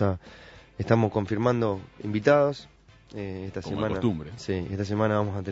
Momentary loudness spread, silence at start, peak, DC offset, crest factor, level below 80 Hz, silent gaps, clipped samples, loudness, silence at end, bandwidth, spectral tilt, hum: 15 LU; 0 s; -4 dBFS; under 0.1%; 22 dB; -54 dBFS; none; under 0.1%; -27 LUFS; 0 s; 8 kHz; -7.5 dB/octave; none